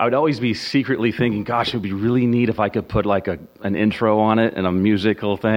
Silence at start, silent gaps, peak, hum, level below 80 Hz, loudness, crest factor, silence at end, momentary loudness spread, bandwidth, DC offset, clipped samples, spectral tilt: 0 s; none; -2 dBFS; none; -46 dBFS; -20 LUFS; 16 dB; 0 s; 5 LU; 15.5 kHz; under 0.1%; under 0.1%; -7.5 dB/octave